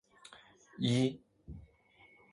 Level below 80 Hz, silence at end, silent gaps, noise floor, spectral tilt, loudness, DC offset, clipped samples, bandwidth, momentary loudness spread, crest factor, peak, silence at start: -62 dBFS; 0.75 s; none; -64 dBFS; -6 dB/octave; -33 LUFS; under 0.1%; under 0.1%; 11 kHz; 25 LU; 20 dB; -18 dBFS; 0.3 s